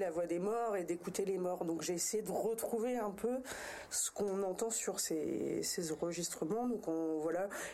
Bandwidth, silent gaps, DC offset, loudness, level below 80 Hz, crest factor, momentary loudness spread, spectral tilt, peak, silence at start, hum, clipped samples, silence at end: 16 kHz; none; under 0.1%; -38 LUFS; -70 dBFS; 14 dB; 3 LU; -3.5 dB/octave; -24 dBFS; 0 s; none; under 0.1%; 0 s